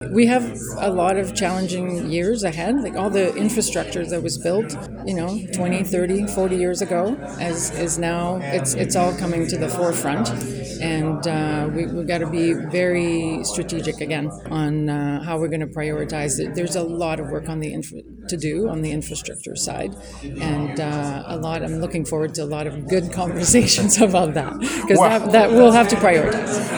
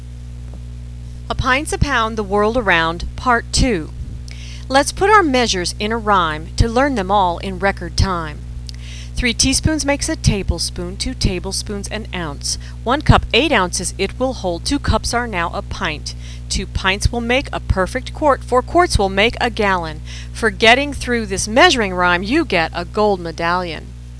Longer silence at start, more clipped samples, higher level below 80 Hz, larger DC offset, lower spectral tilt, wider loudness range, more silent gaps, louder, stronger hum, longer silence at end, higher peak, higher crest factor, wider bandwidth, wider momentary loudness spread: about the same, 0 s vs 0 s; neither; second, -42 dBFS vs -28 dBFS; neither; about the same, -4.5 dB/octave vs -4 dB/octave; first, 9 LU vs 5 LU; neither; second, -20 LUFS vs -17 LUFS; second, none vs 60 Hz at -30 dBFS; about the same, 0 s vs 0 s; about the same, 0 dBFS vs 0 dBFS; about the same, 20 dB vs 18 dB; first, over 20 kHz vs 11 kHz; second, 12 LU vs 17 LU